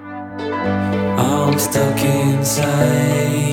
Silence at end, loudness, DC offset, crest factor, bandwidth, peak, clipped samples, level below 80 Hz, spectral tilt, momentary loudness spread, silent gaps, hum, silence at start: 0 s; -17 LUFS; under 0.1%; 14 dB; 18.5 kHz; -2 dBFS; under 0.1%; -46 dBFS; -5.5 dB/octave; 6 LU; none; none; 0 s